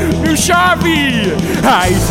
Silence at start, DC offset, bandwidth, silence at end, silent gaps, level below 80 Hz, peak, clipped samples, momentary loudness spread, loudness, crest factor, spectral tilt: 0 s; under 0.1%; 17 kHz; 0 s; none; -26 dBFS; 0 dBFS; under 0.1%; 4 LU; -11 LUFS; 10 dB; -4 dB/octave